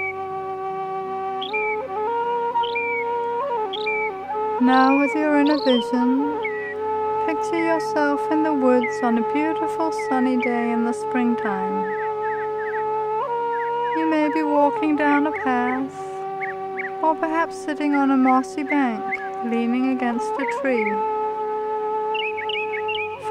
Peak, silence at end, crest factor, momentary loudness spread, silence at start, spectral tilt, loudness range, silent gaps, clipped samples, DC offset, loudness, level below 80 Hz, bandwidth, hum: -4 dBFS; 0 s; 18 dB; 8 LU; 0 s; -5 dB/octave; 4 LU; none; under 0.1%; under 0.1%; -22 LUFS; -66 dBFS; 10.5 kHz; none